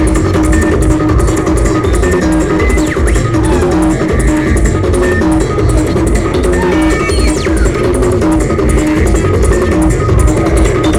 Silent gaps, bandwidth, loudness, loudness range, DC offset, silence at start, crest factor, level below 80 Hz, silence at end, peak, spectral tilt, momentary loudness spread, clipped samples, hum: none; 13.5 kHz; -11 LUFS; 0 LU; 2%; 0 s; 10 dB; -14 dBFS; 0 s; 0 dBFS; -6.5 dB/octave; 1 LU; under 0.1%; none